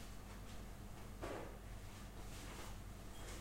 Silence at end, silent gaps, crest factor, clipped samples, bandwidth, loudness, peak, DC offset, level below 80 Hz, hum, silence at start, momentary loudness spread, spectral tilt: 0 s; none; 18 dB; under 0.1%; 16 kHz; -53 LUFS; -32 dBFS; under 0.1%; -56 dBFS; none; 0 s; 5 LU; -4.5 dB/octave